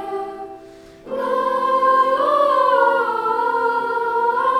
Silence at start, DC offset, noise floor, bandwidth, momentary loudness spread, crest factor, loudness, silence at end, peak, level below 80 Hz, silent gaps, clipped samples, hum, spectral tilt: 0 s; under 0.1%; -42 dBFS; 13 kHz; 13 LU; 14 dB; -18 LUFS; 0 s; -4 dBFS; -60 dBFS; none; under 0.1%; none; -4 dB/octave